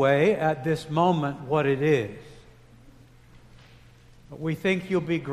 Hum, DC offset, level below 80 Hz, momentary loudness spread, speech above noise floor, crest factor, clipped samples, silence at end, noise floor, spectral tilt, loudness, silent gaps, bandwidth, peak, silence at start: none; under 0.1%; -56 dBFS; 12 LU; 28 dB; 18 dB; under 0.1%; 0 s; -52 dBFS; -7 dB/octave; -25 LUFS; none; 14 kHz; -8 dBFS; 0 s